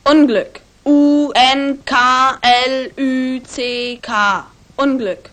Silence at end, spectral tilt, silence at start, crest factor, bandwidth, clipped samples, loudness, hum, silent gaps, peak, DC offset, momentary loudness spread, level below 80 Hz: 0.15 s; -3 dB/octave; 0.05 s; 14 dB; 9.4 kHz; under 0.1%; -14 LUFS; none; none; 0 dBFS; under 0.1%; 10 LU; -50 dBFS